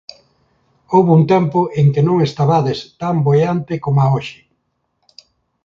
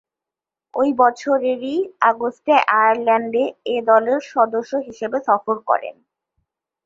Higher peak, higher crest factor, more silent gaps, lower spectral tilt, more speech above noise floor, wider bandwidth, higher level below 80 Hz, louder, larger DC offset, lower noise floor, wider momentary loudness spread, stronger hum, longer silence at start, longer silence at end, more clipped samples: about the same, 0 dBFS vs -2 dBFS; about the same, 16 dB vs 18 dB; neither; first, -8.5 dB/octave vs -4.5 dB/octave; second, 54 dB vs 70 dB; about the same, 7.2 kHz vs 7.6 kHz; first, -52 dBFS vs -70 dBFS; first, -15 LUFS vs -18 LUFS; neither; second, -68 dBFS vs -88 dBFS; about the same, 9 LU vs 8 LU; neither; first, 0.9 s vs 0.75 s; first, 1.3 s vs 0.95 s; neither